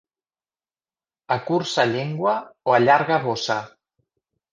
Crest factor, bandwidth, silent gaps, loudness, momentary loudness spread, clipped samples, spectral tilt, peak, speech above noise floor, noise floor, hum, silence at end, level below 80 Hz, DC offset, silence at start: 20 dB; 9.6 kHz; none; -21 LUFS; 10 LU; under 0.1%; -5 dB/octave; -4 dBFS; over 69 dB; under -90 dBFS; none; 0.85 s; -68 dBFS; under 0.1%; 1.3 s